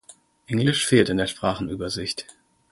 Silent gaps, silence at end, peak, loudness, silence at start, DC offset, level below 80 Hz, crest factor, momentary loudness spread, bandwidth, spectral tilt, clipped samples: none; 0.4 s; -2 dBFS; -23 LUFS; 0.1 s; under 0.1%; -50 dBFS; 22 dB; 10 LU; 12 kHz; -4.5 dB/octave; under 0.1%